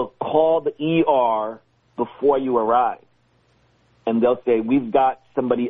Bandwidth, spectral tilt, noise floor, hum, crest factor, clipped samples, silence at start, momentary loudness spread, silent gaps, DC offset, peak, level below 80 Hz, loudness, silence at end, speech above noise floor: 3.9 kHz; -5.5 dB/octave; -61 dBFS; none; 16 dB; under 0.1%; 0 s; 11 LU; none; under 0.1%; -4 dBFS; -60 dBFS; -20 LUFS; 0 s; 42 dB